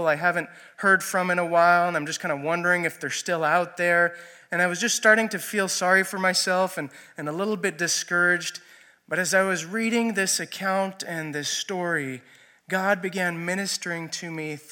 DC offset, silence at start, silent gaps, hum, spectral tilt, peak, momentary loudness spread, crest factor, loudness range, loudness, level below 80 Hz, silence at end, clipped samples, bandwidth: under 0.1%; 0 s; none; none; -3 dB/octave; -4 dBFS; 11 LU; 20 dB; 5 LU; -24 LUFS; -80 dBFS; 0.1 s; under 0.1%; 17.5 kHz